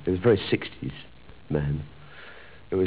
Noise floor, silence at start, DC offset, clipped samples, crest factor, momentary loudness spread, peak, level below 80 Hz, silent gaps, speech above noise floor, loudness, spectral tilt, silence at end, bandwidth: -48 dBFS; 0 s; 0.4%; under 0.1%; 20 dB; 23 LU; -8 dBFS; -46 dBFS; none; 22 dB; -27 LUFS; -11 dB/octave; 0 s; 4 kHz